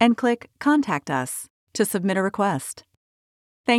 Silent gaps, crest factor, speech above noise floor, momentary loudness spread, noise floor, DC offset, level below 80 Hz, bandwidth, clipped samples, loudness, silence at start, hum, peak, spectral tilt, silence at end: 1.50-1.67 s, 2.97-3.64 s; 18 dB; over 67 dB; 13 LU; under -90 dBFS; under 0.1%; -68 dBFS; 16.5 kHz; under 0.1%; -24 LUFS; 0 s; none; -4 dBFS; -4.5 dB/octave; 0 s